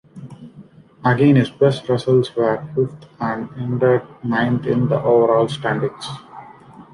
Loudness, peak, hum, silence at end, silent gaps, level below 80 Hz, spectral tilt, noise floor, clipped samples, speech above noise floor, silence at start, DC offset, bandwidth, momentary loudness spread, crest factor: -18 LUFS; -2 dBFS; none; 0.1 s; none; -54 dBFS; -7.5 dB/octave; -44 dBFS; under 0.1%; 27 dB; 0.15 s; under 0.1%; 11 kHz; 14 LU; 16 dB